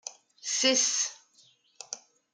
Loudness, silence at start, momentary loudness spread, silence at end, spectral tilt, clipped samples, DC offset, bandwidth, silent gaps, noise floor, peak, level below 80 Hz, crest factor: -25 LUFS; 0.05 s; 20 LU; 0.35 s; 1.5 dB/octave; under 0.1%; under 0.1%; 10.5 kHz; none; -63 dBFS; -12 dBFS; -90 dBFS; 20 dB